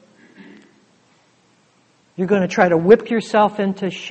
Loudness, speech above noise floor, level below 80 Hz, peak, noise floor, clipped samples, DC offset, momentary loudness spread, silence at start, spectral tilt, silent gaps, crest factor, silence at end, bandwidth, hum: -17 LUFS; 41 dB; -58 dBFS; 0 dBFS; -58 dBFS; under 0.1%; under 0.1%; 12 LU; 2.2 s; -6.5 dB/octave; none; 20 dB; 0 s; 8.4 kHz; none